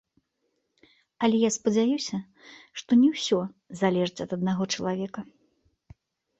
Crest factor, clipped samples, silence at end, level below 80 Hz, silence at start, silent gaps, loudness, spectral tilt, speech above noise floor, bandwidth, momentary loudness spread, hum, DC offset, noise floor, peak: 20 dB; under 0.1%; 1.15 s; -66 dBFS; 1.2 s; none; -26 LUFS; -5 dB/octave; 51 dB; 8.2 kHz; 15 LU; none; under 0.1%; -77 dBFS; -8 dBFS